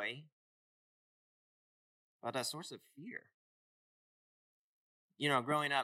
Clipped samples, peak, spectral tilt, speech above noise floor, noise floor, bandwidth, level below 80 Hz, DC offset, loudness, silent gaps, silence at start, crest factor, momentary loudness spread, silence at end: under 0.1%; -18 dBFS; -3.5 dB/octave; over 51 dB; under -90 dBFS; 16 kHz; under -90 dBFS; under 0.1%; -37 LUFS; 0.32-2.19 s, 3.34-5.09 s; 0 s; 24 dB; 18 LU; 0 s